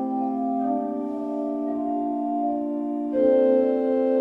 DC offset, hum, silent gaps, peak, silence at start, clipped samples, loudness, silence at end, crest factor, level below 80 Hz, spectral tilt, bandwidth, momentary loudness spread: under 0.1%; none; none; -8 dBFS; 0 s; under 0.1%; -24 LUFS; 0 s; 14 dB; -64 dBFS; -9 dB/octave; 4.4 kHz; 9 LU